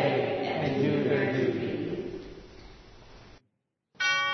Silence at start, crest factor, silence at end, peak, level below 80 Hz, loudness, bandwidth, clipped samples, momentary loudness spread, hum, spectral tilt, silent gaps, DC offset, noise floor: 0 s; 16 dB; 0 s; -14 dBFS; -58 dBFS; -29 LUFS; 6.4 kHz; under 0.1%; 18 LU; none; -5.5 dB/octave; none; under 0.1%; -78 dBFS